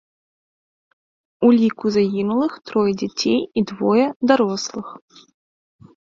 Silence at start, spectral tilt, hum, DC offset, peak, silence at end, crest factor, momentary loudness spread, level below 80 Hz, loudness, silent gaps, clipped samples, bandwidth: 1.4 s; -5.5 dB/octave; none; under 0.1%; -2 dBFS; 1.05 s; 20 dB; 8 LU; -60 dBFS; -19 LUFS; 4.16-4.20 s; under 0.1%; 7.4 kHz